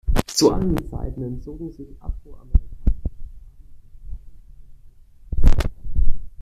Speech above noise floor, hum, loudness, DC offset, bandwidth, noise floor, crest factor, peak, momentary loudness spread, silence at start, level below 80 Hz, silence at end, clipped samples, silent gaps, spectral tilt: 23 dB; none; -25 LUFS; under 0.1%; 13.5 kHz; -45 dBFS; 18 dB; -2 dBFS; 24 LU; 0.05 s; -24 dBFS; 0 s; under 0.1%; none; -5.5 dB/octave